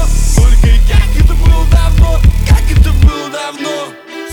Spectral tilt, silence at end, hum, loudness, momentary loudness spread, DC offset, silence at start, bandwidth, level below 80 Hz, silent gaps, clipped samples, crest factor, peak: -5.5 dB/octave; 0 s; none; -11 LUFS; 10 LU; under 0.1%; 0 s; 16.5 kHz; -8 dBFS; none; 2%; 8 dB; 0 dBFS